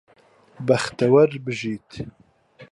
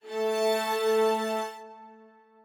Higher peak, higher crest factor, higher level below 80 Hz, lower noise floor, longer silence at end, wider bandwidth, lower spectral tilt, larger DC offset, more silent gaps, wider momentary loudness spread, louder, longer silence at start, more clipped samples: first, -4 dBFS vs -16 dBFS; about the same, 18 dB vs 14 dB; first, -58 dBFS vs under -90 dBFS; second, -50 dBFS vs -55 dBFS; second, 0.05 s vs 0.5 s; second, 11.5 kHz vs over 20 kHz; first, -6 dB/octave vs -3 dB/octave; neither; neither; first, 20 LU vs 16 LU; first, -21 LUFS vs -27 LUFS; first, 0.6 s vs 0.05 s; neither